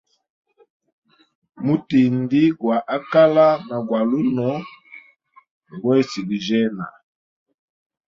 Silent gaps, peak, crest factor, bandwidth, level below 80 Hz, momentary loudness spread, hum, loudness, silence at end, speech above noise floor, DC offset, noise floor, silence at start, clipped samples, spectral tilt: 5.51-5.61 s; -2 dBFS; 18 dB; 7.4 kHz; -64 dBFS; 13 LU; none; -19 LUFS; 1.3 s; 35 dB; under 0.1%; -54 dBFS; 1.6 s; under 0.1%; -7.5 dB/octave